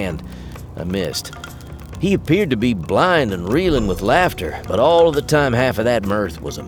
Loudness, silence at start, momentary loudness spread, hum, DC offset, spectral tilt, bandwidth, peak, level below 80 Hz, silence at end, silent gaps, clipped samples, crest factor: -18 LUFS; 0 s; 18 LU; none; under 0.1%; -5.5 dB/octave; over 20 kHz; -2 dBFS; -36 dBFS; 0 s; none; under 0.1%; 16 dB